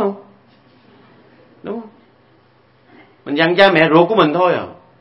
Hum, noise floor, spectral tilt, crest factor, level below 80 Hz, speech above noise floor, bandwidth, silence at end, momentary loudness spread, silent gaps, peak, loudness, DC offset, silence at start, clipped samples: none; -53 dBFS; -7.5 dB/octave; 18 dB; -60 dBFS; 39 dB; 6.2 kHz; 0.3 s; 24 LU; none; 0 dBFS; -13 LUFS; under 0.1%; 0 s; under 0.1%